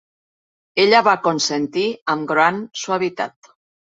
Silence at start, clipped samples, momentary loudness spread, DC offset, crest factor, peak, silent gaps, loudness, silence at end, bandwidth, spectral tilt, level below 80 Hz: 0.75 s; under 0.1%; 12 LU; under 0.1%; 20 dB; 0 dBFS; 2.01-2.06 s; -18 LUFS; 0.65 s; 8 kHz; -3.5 dB/octave; -66 dBFS